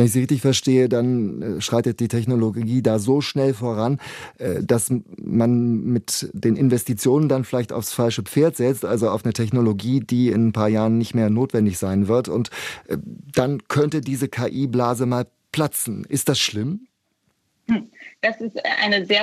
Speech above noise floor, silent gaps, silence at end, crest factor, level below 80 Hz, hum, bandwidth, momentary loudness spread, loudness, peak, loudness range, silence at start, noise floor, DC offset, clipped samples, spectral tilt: 49 dB; none; 0 s; 18 dB; -60 dBFS; none; 15.5 kHz; 8 LU; -21 LUFS; -4 dBFS; 3 LU; 0 s; -69 dBFS; under 0.1%; under 0.1%; -5.5 dB/octave